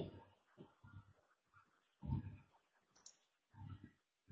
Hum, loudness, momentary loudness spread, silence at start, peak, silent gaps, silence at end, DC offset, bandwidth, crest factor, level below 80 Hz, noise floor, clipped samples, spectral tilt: none; -53 LUFS; 19 LU; 0 s; -30 dBFS; none; 0 s; under 0.1%; 7.6 kHz; 26 dB; -64 dBFS; -78 dBFS; under 0.1%; -8 dB/octave